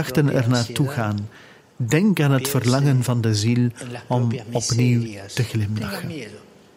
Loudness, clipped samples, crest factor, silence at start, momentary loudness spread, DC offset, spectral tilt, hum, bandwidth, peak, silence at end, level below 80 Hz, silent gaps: -21 LUFS; under 0.1%; 16 dB; 0 s; 11 LU; under 0.1%; -6 dB/octave; none; 16 kHz; -4 dBFS; 0.4 s; -54 dBFS; none